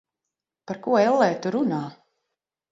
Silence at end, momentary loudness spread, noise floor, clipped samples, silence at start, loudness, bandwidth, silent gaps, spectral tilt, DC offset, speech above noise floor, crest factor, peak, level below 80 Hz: 0.8 s; 16 LU; -86 dBFS; under 0.1%; 0.7 s; -23 LUFS; 7.8 kHz; none; -6.5 dB/octave; under 0.1%; 64 dB; 20 dB; -6 dBFS; -74 dBFS